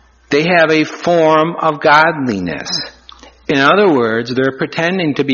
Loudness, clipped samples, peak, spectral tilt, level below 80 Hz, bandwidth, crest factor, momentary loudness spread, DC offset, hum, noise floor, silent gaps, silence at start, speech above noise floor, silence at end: -13 LUFS; under 0.1%; 0 dBFS; -5 dB/octave; -52 dBFS; 7.2 kHz; 14 dB; 10 LU; under 0.1%; none; -40 dBFS; none; 0.3 s; 28 dB; 0 s